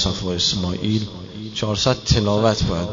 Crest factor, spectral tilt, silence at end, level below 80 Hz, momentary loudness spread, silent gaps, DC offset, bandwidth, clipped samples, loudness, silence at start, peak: 18 dB; -5 dB/octave; 0 s; -34 dBFS; 10 LU; none; 0.1%; 7.6 kHz; under 0.1%; -20 LUFS; 0 s; -4 dBFS